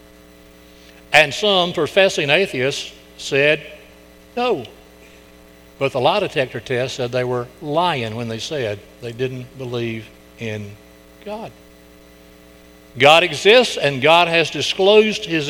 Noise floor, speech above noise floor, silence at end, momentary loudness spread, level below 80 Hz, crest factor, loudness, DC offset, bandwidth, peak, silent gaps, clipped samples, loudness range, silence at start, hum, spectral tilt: -45 dBFS; 28 dB; 0 s; 19 LU; -52 dBFS; 20 dB; -17 LUFS; under 0.1%; 19 kHz; 0 dBFS; none; under 0.1%; 14 LU; 1.1 s; none; -4 dB/octave